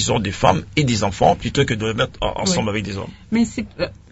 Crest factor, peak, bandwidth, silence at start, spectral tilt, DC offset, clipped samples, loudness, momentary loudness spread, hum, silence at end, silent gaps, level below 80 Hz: 18 dB; -2 dBFS; 8.2 kHz; 0 s; -4.5 dB/octave; under 0.1%; under 0.1%; -20 LUFS; 9 LU; none; 0.15 s; none; -38 dBFS